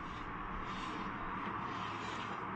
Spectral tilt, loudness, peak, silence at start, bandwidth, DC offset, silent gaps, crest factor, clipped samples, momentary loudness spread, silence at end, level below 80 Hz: -5 dB/octave; -42 LUFS; -30 dBFS; 0 s; 9.4 kHz; under 0.1%; none; 12 dB; under 0.1%; 3 LU; 0 s; -54 dBFS